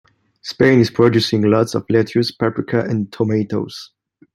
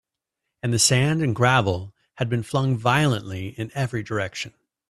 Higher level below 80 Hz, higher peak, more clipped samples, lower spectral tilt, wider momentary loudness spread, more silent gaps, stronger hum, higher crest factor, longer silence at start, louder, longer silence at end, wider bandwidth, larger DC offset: about the same, -54 dBFS vs -56 dBFS; about the same, -2 dBFS vs -2 dBFS; neither; first, -6.5 dB/octave vs -4.5 dB/octave; about the same, 13 LU vs 13 LU; neither; neither; about the same, 16 dB vs 20 dB; second, 0.45 s vs 0.65 s; first, -17 LUFS vs -22 LUFS; about the same, 0.5 s vs 0.4 s; about the same, 13.5 kHz vs 13.5 kHz; neither